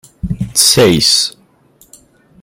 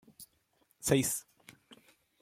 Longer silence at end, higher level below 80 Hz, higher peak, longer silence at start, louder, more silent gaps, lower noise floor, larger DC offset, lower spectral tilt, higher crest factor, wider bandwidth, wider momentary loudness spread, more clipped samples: first, 1.1 s vs 0.45 s; first, -36 dBFS vs -64 dBFS; first, 0 dBFS vs -12 dBFS; about the same, 0.25 s vs 0.2 s; first, -10 LUFS vs -32 LUFS; neither; second, -49 dBFS vs -73 dBFS; neither; about the same, -3 dB/octave vs -4 dB/octave; second, 14 dB vs 24 dB; first, over 20 kHz vs 16.5 kHz; second, 14 LU vs 25 LU; neither